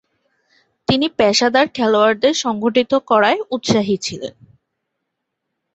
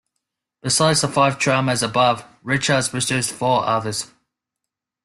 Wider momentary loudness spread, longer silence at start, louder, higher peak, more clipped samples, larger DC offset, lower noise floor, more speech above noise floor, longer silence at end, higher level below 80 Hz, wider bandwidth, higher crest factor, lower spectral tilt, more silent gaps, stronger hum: about the same, 9 LU vs 10 LU; first, 0.9 s vs 0.65 s; first, -16 LUFS vs -19 LUFS; about the same, -2 dBFS vs -4 dBFS; neither; neither; second, -77 dBFS vs -84 dBFS; about the same, 61 dB vs 64 dB; first, 1.45 s vs 1 s; about the same, -54 dBFS vs -56 dBFS; second, 8.2 kHz vs 12.5 kHz; about the same, 16 dB vs 18 dB; about the same, -4 dB/octave vs -3.5 dB/octave; neither; neither